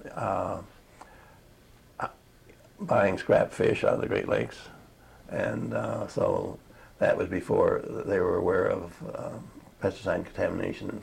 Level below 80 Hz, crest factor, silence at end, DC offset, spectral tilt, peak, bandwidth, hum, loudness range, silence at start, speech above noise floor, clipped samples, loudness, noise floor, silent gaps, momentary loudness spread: -56 dBFS; 20 dB; 0 s; under 0.1%; -7 dB/octave; -10 dBFS; 15.5 kHz; none; 3 LU; 0 s; 28 dB; under 0.1%; -29 LUFS; -56 dBFS; none; 14 LU